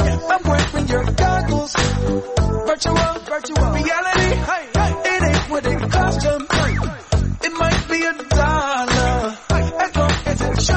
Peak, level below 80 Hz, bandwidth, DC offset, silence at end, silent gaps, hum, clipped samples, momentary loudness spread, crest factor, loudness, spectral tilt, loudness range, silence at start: -6 dBFS; -24 dBFS; 8.8 kHz; under 0.1%; 0 s; none; none; under 0.1%; 4 LU; 12 dB; -18 LUFS; -5 dB/octave; 1 LU; 0 s